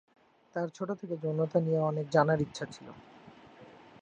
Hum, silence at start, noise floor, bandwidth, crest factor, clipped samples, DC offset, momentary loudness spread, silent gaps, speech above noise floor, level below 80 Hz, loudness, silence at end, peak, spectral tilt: none; 0.55 s; -54 dBFS; 9 kHz; 22 dB; under 0.1%; under 0.1%; 17 LU; none; 24 dB; -68 dBFS; -31 LUFS; 0.4 s; -10 dBFS; -7 dB/octave